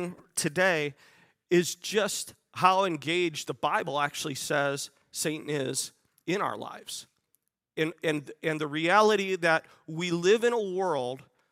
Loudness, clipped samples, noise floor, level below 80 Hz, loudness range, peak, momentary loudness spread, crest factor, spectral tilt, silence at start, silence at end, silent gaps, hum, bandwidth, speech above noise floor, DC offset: -28 LUFS; under 0.1%; -76 dBFS; -78 dBFS; 7 LU; -8 dBFS; 14 LU; 22 dB; -3.5 dB/octave; 0 s; 0.3 s; none; none; 16 kHz; 48 dB; under 0.1%